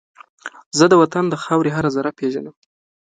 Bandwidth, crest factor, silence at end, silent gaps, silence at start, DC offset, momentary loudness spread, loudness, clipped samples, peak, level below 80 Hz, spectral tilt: 9.4 kHz; 18 dB; 0.6 s; 0.66-0.71 s; 0.45 s; under 0.1%; 23 LU; -17 LUFS; under 0.1%; 0 dBFS; -58 dBFS; -5.5 dB/octave